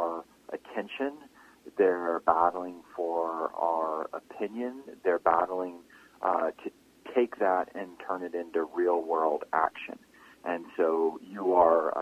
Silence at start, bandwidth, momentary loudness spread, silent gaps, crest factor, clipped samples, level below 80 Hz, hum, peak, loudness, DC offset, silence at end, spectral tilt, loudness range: 0 s; 14.5 kHz; 15 LU; none; 24 dB; under 0.1%; -70 dBFS; none; -6 dBFS; -29 LUFS; under 0.1%; 0 s; -6 dB/octave; 2 LU